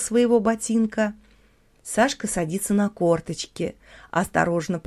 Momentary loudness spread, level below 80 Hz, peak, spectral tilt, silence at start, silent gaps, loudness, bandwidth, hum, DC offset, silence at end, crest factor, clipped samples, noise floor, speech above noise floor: 10 LU; -52 dBFS; -4 dBFS; -5 dB/octave; 0 s; none; -23 LUFS; 14.5 kHz; none; under 0.1%; 0.05 s; 18 dB; under 0.1%; -58 dBFS; 35 dB